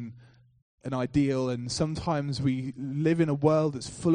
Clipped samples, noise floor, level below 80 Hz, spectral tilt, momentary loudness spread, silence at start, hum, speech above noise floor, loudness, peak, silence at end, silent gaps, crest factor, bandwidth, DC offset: under 0.1%; -55 dBFS; -54 dBFS; -6.5 dB/octave; 9 LU; 0 s; none; 28 dB; -28 LUFS; -10 dBFS; 0 s; 0.62-0.78 s; 18 dB; 10 kHz; under 0.1%